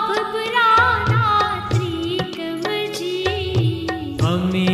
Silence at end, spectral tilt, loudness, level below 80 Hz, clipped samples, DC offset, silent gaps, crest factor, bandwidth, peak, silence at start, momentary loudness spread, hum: 0 s; -6 dB/octave; -19 LUFS; -42 dBFS; under 0.1%; under 0.1%; none; 14 dB; 14.5 kHz; -4 dBFS; 0 s; 9 LU; none